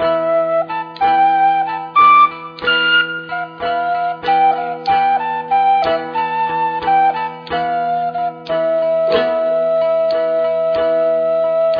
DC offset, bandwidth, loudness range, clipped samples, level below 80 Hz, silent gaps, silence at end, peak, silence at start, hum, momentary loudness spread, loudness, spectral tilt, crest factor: under 0.1%; 5.4 kHz; 3 LU; under 0.1%; -54 dBFS; none; 0 s; -2 dBFS; 0 s; none; 8 LU; -15 LUFS; -6 dB/octave; 14 dB